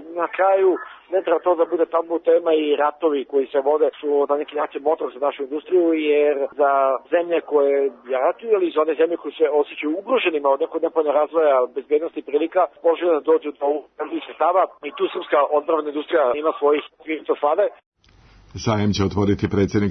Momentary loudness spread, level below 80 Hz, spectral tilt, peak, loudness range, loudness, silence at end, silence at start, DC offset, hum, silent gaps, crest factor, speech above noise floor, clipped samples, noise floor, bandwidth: 7 LU; -56 dBFS; -6.5 dB/octave; -8 dBFS; 2 LU; -20 LUFS; 0 s; 0 s; under 0.1%; none; 17.86-17.92 s; 12 dB; 32 dB; under 0.1%; -52 dBFS; 6.4 kHz